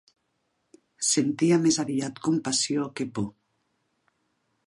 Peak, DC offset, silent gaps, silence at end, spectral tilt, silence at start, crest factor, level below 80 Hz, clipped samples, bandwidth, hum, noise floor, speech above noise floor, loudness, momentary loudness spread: -10 dBFS; under 0.1%; none; 1.35 s; -4 dB/octave; 1 s; 18 dB; -66 dBFS; under 0.1%; 11.5 kHz; none; -75 dBFS; 50 dB; -25 LUFS; 10 LU